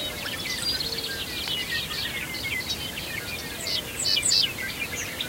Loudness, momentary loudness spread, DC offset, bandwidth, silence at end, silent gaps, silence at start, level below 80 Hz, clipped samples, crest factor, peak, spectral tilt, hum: -26 LUFS; 10 LU; under 0.1%; 16 kHz; 0 s; none; 0 s; -48 dBFS; under 0.1%; 18 dB; -10 dBFS; -1 dB/octave; none